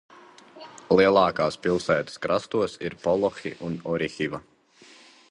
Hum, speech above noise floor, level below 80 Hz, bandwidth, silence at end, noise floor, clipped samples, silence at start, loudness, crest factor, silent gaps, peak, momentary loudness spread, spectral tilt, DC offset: none; 29 dB; -58 dBFS; 11 kHz; 0.9 s; -53 dBFS; under 0.1%; 0.55 s; -25 LUFS; 20 dB; none; -4 dBFS; 15 LU; -5.5 dB/octave; under 0.1%